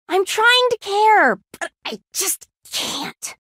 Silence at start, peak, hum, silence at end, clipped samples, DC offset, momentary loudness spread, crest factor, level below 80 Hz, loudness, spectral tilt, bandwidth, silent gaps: 0.1 s; -4 dBFS; none; 0.1 s; under 0.1%; under 0.1%; 15 LU; 16 dB; -68 dBFS; -18 LUFS; -0.5 dB/octave; 16 kHz; none